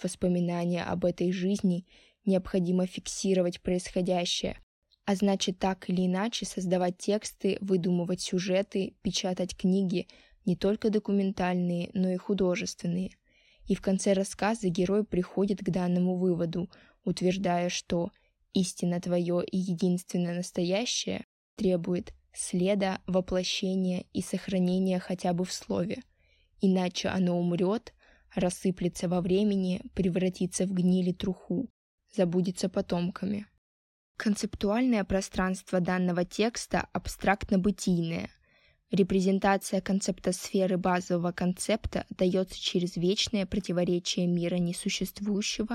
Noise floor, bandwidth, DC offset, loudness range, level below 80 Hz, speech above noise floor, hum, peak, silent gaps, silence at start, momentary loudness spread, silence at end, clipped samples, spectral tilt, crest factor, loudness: -66 dBFS; 13.5 kHz; under 0.1%; 2 LU; -54 dBFS; 38 dB; none; -8 dBFS; 4.63-4.82 s, 21.24-21.57 s, 31.70-31.98 s, 33.58-34.15 s; 0 s; 7 LU; 0 s; under 0.1%; -5.5 dB/octave; 20 dB; -29 LUFS